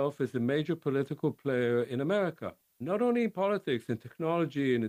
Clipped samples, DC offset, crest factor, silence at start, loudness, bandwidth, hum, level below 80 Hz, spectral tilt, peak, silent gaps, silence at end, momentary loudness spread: under 0.1%; under 0.1%; 12 dB; 0 s; -31 LUFS; 15.5 kHz; none; -74 dBFS; -7.5 dB/octave; -18 dBFS; none; 0 s; 6 LU